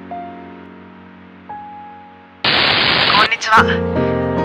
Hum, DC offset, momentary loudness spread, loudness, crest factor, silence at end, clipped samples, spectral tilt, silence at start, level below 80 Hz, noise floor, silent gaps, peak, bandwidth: none; under 0.1%; 23 LU; -13 LUFS; 18 dB; 0 s; under 0.1%; -4 dB/octave; 0 s; -42 dBFS; -40 dBFS; none; 0 dBFS; 15.5 kHz